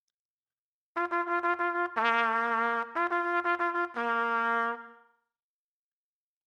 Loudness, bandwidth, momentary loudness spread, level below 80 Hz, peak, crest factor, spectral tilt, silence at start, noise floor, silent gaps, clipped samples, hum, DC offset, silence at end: -29 LUFS; 10 kHz; 5 LU; -88 dBFS; -12 dBFS; 20 dB; -4 dB/octave; 0.95 s; under -90 dBFS; none; under 0.1%; none; under 0.1%; 1.55 s